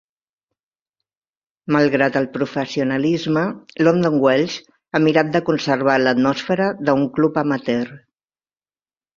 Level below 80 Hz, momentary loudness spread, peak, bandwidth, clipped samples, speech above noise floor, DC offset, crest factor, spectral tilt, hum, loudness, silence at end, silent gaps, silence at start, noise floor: -60 dBFS; 8 LU; -2 dBFS; 7.4 kHz; under 0.1%; over 72 dB; under 0.1%; 18 dB; -6.5 dB/octave; none; -18 LUFS; 1.2 s; none; 1.7 s; under -90 dBFS